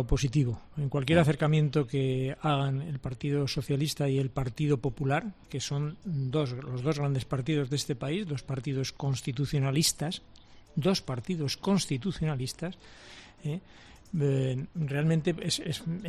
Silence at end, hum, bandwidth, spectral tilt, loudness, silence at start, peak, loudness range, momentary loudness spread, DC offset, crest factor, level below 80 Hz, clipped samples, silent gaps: 0 s; none; 13.5 kHz; -5.5 dB/octave; -30 LUFS; 0 s; -10 dBFS; 4 LU; 10 LU; under 0.1%; 20 dB; -48 dBFS; under 0.1%; none